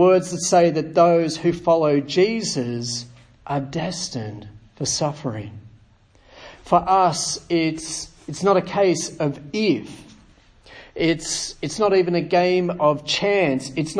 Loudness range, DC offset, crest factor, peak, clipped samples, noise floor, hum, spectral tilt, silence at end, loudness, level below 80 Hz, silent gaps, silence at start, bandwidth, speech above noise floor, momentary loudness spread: 7 LU; under 0.1%; 20 dB; -2 dBFS; under 0.1%; -54 dBFS; none; -4.5 dB/octave; 0 s; -21 LUFS; -52 dBFS; none; 0 s; 10.5 kHz; 34 dB; 13 LU